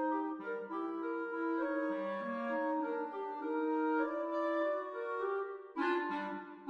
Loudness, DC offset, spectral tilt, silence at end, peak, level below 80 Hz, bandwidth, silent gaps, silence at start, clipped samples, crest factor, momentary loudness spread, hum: -37 LUFS; under 0.1%; -7 dB/octave; 0 s; -22 dBFS; -84 dBFS; 6.2 kHz; none; 0 s; under 0.1%; 14 dB; 6 LU; none